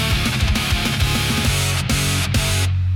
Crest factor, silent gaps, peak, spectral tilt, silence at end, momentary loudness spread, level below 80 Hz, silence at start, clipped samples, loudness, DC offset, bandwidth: 12 dB; none; -6 dBFS; -3.5 dB/octave; 0 s; 1 LU; -26 dBFS; 0 s; under 0.1%; -18 LUFS; under 0.1%; 18 kHz